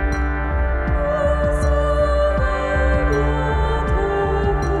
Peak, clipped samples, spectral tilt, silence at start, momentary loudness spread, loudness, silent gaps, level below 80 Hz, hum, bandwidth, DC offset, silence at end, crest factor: -6 dBFS; under 0.1%; -7 dB/octave; 0 s; 3 LU; -19 LUFS; none; -22 dBFS; none; 10.5 kHz; under 0.1%; 0 s; 12 dB